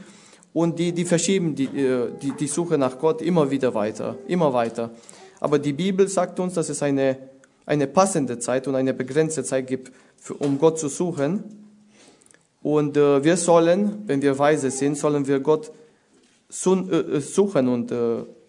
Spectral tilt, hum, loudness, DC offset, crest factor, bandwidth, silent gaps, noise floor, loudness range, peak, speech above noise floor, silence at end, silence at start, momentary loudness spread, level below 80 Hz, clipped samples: -5.5 dB/octave; none; -22 LUFS; under 0.1%; 20 dB; 11 kHz; none; -59 dBFS; 4 LU; -2 dBFS; 38 dB; 0.2 s; 0 s; 9 LU; -68 dBFS; under 0.1%